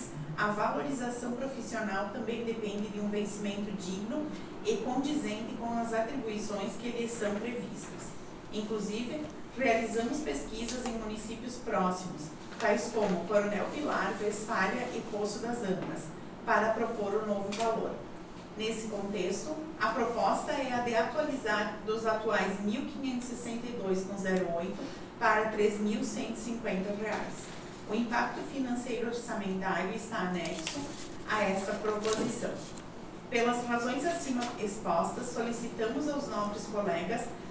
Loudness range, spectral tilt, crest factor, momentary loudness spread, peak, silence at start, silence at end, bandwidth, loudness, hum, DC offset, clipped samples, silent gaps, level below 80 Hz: 3 LU; -4.5 dB/octave; 20 dB; 10 LU; -12 dBFS; 0 s; 0 s; 8 kHz; -34 LUFS; none; under 0.1%; under 0.1%; none; -58 dBFS